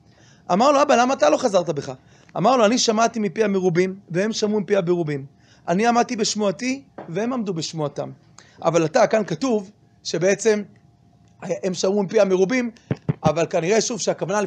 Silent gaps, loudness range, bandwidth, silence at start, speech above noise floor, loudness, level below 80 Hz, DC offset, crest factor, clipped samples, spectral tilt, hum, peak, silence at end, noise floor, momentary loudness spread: none; 4 LU; 10 kHz; 0.5 s; 34 dB; -21 LUFS; -60 dBFS; under 0.1%; 18 dB; under 0.1%; -4.5 dB/octave; none; -4 dBFS; 0 s; -54 dBFS; 12 LU